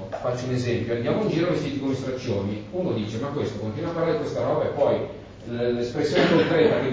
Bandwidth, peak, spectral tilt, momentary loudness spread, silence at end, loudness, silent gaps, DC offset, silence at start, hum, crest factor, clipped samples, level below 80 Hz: 7.8 kHz; -6 dBFS; -6.5 dB/octave; 9 LU; 0 s; -25 LUFS; none; under 0.1%; 0 s; none; 18 dB; under 0.1%; -50 dBFS